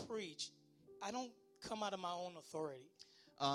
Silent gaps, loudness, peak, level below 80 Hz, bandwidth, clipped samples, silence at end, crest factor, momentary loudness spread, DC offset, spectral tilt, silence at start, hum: none; -47 LUFS; -24 dBFS; -82 dBFS; 15.5 kHz; under 0.1%; 0 s; 22 dB; 19 LU; under 0.1%; -3.5 dB/octave; 0 s; none